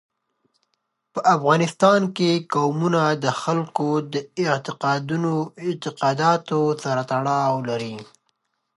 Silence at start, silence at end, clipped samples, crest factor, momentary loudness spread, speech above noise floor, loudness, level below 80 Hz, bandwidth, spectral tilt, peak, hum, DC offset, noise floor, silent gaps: 1.15 s; 0.7 s; under 0.1%; 20 dB; 10 LU; 53 dB; -21 LUFS; -72 dBFS; 11.5 kHz; -6 dB/octave; -4 dBFS; none; under 0.1%; -75 dBFS; none